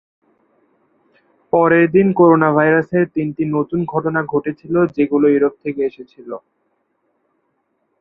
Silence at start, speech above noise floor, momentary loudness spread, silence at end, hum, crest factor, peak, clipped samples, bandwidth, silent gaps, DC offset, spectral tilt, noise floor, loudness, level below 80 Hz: 1.55 s; 52 dB; 12 LU; 1.65 s; none; 16 dB; -2 dBFS; under 0.1%; 4 kHz; none; under 0.1%; -11.5 dB/octave; -67 dBFS; -16 LUFS; -56 dBFS